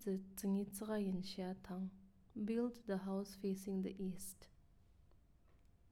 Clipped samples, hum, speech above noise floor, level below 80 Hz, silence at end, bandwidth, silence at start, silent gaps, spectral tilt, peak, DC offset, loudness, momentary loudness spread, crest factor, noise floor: under 0.1%; none; 25 dB; -70 dBFS; 0 s; 17 kHz; 0 s; none; -6.5 dB/octave; -30 dBFS; under 0.1%; -44 LUFS; 9 LU; 14 dB; -69 dBFS